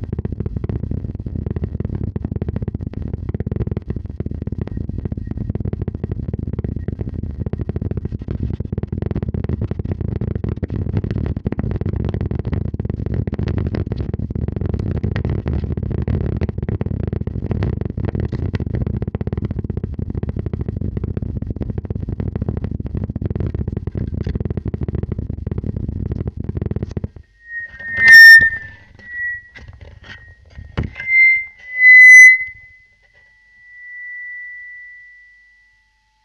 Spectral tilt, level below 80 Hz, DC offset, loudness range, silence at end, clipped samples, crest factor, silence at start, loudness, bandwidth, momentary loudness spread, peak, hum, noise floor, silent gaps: -5 dB/octave; -32 dBFS; under 0.1%; 17 LU; 1.2 s; 0.4%; 18 dB; 0 s; -15 LUFS; 11.5 kHz; 16 LU; 0 dBFS; none; -60 dBFS; none